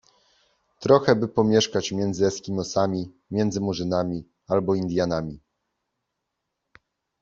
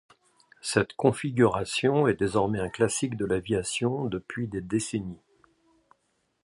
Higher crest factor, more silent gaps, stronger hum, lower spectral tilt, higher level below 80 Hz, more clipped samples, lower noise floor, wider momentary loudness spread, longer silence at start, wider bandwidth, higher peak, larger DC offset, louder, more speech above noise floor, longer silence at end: about the same, 22 dB vs 22 dB; neither; neither; about the same, -5.5 dB/octave vs -5 dB/octave; about the same, -58 dBFS vs -54 dBFS; neither; first, -81 dBFS vs -73 dBFS; about the same, 10 LU vs 9 LU; first, 0.8 s vs 0.65 s; second, 7.8 kHz vs 11.5 kHz; about the same, -4 dBFS vs -6 dBFS; neither; first, -24 LUFS vs -27 LUFS; first, 58 dB vs 47 dB; first, 1.85 s vs 1.3 s